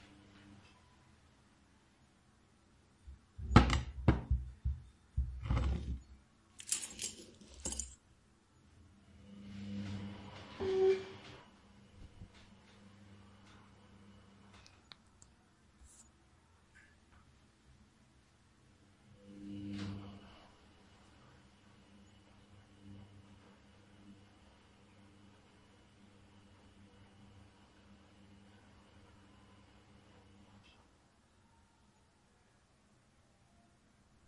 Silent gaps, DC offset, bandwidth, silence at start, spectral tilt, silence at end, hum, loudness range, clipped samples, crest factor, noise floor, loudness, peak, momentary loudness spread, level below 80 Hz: none; under 0.1%; 11 kHz; 0.35 s; -5.5 dB/octave; 3.7 s; none; 27 LU; under 0.1%; 36 dB; -70 dBFS; -38 LUFS; -8 dBFS; 27 LU; -50 dBFS